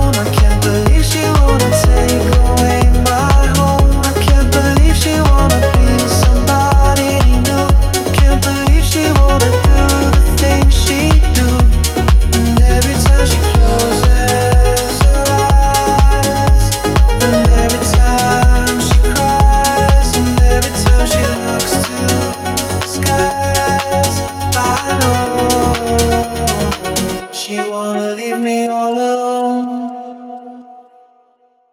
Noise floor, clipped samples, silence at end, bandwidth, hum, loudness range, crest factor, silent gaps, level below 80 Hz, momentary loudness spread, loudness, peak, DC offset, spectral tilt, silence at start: -55 dBFS; under 0.1%; 1.1 s; 16 kHz; none; 5 LU; 10 dB; none; -14 dBFS; 6 LU; -13 LUFS; 0 dBFS; under 0.1%; -5 dB/octave; 0 s